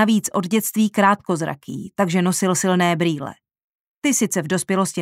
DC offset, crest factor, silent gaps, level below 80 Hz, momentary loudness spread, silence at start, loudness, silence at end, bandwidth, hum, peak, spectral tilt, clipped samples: under 0.1%; 16 dB; 3.63-4.01 s; -64 dBFS; 9 LU; 0 s; -20 LUFS; 0 s; 16 kHz; none; -4 dBFS; -4.5 dB/octave; under 0.1%